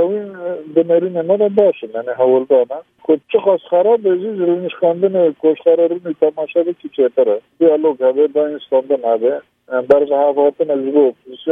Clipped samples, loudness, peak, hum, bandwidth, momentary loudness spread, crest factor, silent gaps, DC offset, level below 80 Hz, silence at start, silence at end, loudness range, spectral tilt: under 0.1%; -15 LUFS; 0 dBFS; none; 3.7 kHz; 8 LU; 14 dB; none; under 0.1%; -68 dBFS; 0 s; 0 s; 1 LU; -9 dB/octave